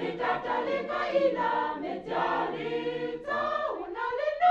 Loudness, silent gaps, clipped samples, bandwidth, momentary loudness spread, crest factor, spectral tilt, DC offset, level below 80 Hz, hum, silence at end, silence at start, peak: -30 LUFS; none; under 0.1%; 7.8 kHz; 7 LU; 16 dB; -6 dB/octave; under 0.1%; -62 dBFS; none; 0 s; 0 s; -12 dBFS